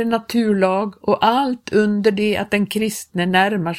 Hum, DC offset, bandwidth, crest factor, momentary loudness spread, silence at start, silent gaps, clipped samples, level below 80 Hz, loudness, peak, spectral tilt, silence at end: none; under 0.1%; 16 kHz; 16 dB; 5 LU; 0 s; none; under 0.1%; -56 dBFS; -18 LUFS; -2 dBFS; -5.5 dB/octave; 0 s